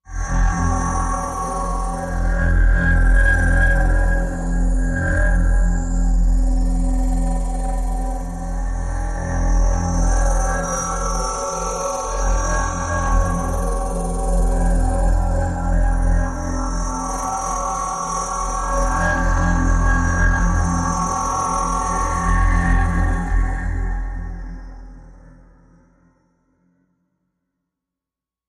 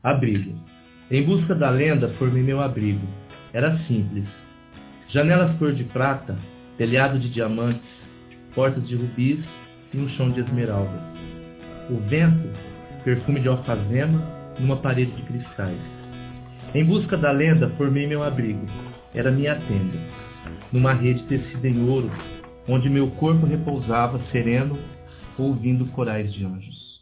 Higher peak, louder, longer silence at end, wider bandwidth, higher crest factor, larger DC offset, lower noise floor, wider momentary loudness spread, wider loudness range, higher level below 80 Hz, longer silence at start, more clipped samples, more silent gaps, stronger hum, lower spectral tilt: about the same, -4 dBFS vs -4 dBFS; about the same, -21 LUFS vs -23 LUFS; first, 3.2 s vs 0.05 s; first, 11.5 kHz vs 4 kHz; about the same, 14 dB vs 18 dB; neither; first, -88 dBFS vs -45 dBFS; second, 7 LU vs 18 LU; about the same, 5 LU vs 3 LU; first, -20 dBFS vs -46 dBFS; about the same, 0.1 s vs 0.05 s; neither; neither; neither; second, -5.5 dB/octave vs -12 dB/octave